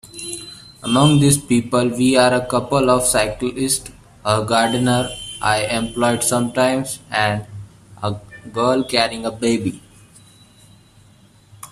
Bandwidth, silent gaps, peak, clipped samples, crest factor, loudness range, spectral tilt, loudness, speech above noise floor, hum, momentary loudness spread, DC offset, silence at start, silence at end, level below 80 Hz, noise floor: 15 kHz; none; 0 dBFS; under 0.1%; 18 dB; 6 LU; -4.5 dB/octave; -18 LUFS; 32 dB; none; 14 LU; under 0.1%; 0.05 s; 0.05 s; -46 dBFS; -50 dBFS